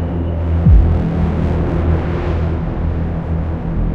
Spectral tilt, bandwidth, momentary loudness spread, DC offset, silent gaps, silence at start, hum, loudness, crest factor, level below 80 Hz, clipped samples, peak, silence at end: -10 dB/octave; 4.6 kHz; 8 LU; 1%; none; 0 s; none; -17 LUFS; 14 dB; -20 dBFS; under 0.1%; 0 dBFS; 0 s